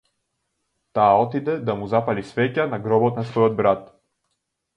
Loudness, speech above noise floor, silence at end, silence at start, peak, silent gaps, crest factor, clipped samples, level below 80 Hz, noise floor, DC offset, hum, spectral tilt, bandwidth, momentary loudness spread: -21 LUFS; 56 dB; 0.9 s; 0.95 s; -4 dBFS; none; 18 dB; under 0.1%; -58 dBFS; -76 dBFS; under 0.1%; none; -8.5 dB/octave; 8.8 kHz; 8 LU